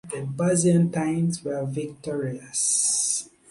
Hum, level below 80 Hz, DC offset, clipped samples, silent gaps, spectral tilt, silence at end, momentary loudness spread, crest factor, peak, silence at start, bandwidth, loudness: none; -62 dBFS; under 0.1%; under 0.1%; none; -4.5 dB/octave; 0.2 s; 11 LU; 16 dB; -10 dBFS; 0.05 s; 11.5 kHz; -24 LUFS